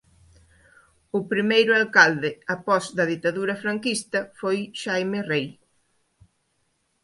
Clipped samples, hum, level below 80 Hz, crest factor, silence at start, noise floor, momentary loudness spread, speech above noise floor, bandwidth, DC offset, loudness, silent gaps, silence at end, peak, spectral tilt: under 0.1%; none; -66 dBFS; 24 dB; 1.15 s; -71 dBFS; 11 LU; 48 dB; 11.5 kHz; under 0.1%; -23 LUFS; none; 1.55 s; 0 dBFS; -4 dB/octave